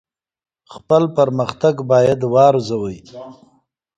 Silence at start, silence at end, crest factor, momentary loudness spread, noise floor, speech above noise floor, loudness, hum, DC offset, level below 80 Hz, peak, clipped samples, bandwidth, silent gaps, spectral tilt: 0.7 s; 0.65 s; 18 dB; 18 LU; -60 dBFS; 44 dB; -16 LUFS; none; under 0.1%; -54 dBFS; 0 dBFS; under 0.1%; 9 kHz; none; -7 dB/octave